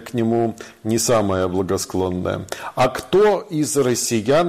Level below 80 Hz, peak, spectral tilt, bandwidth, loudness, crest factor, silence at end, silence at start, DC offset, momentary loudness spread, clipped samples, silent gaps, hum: -50 dBFS; -8 dBFS; -4.5 dB/octave; 15.5 kHz; -20 LUFS; 12 dB; 0 s; 0 s; under 0.1%; 8 LU; under 0.1%; none; none